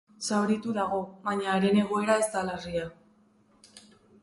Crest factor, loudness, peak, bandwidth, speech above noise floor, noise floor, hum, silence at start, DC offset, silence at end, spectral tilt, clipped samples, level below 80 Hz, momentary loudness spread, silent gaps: 20 dB; -28 LUFS; -8 dBFS; 12 kHz; 35 dB; -63 dBFS; none; 0.2 s; under 0.1%; 0.45 s; -5 dB/octave; under 0.1%; -62 dBFS; 9 LU; none